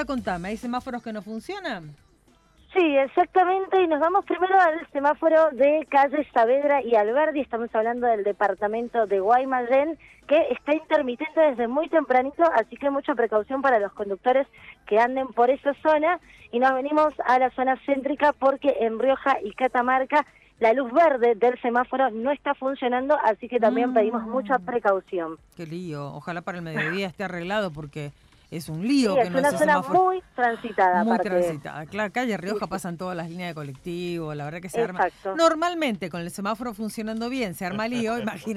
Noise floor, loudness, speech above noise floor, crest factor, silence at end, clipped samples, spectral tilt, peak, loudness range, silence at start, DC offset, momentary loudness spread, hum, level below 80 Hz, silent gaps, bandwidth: -59 dBFS; -23 LUFS; 36 dB; 16 dB; 0 s; under 0.1%; -5.5 dB/octave; -6 dBFS; 7 LU; 0 s; under 0.1%; 12 LU; none; -60 dBFS; none; 14 kHz